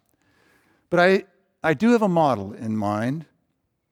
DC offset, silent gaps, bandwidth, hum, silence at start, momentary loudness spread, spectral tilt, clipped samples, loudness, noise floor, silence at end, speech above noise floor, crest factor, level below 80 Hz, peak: under 0.1%; none; 14 kHz; none; 0.9 s; 10 LU; -7 dB/octave; under 0.1%; -22 LUFS; -73 dBFS; 0.7 s; 53 dB; 18 dB; -66 dBFS; -6 dBFS